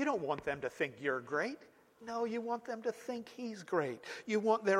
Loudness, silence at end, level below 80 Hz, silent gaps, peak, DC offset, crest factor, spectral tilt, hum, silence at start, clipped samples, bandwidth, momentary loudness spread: -38 LUFS; 0 s; -76 dBFS; none; -18 dBFS; under 0.1%; 20 dB; -5 dB/octave; none; 0 s; under 0.1%; 14.5 kHz; 10 LU